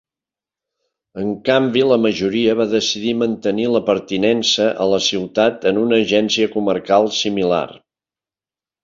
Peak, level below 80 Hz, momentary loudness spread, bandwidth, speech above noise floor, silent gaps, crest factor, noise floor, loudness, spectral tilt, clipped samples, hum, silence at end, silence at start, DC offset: -2 dBFS; -56 dBFS; 5 LU; 7.6 kHz; over 73 dB; none; 16 dB; under -90 dBFS; -17 LUFS; -4 dB/octave; under 0.1%; none; 1.05 s; 1.15 s; under 0.1%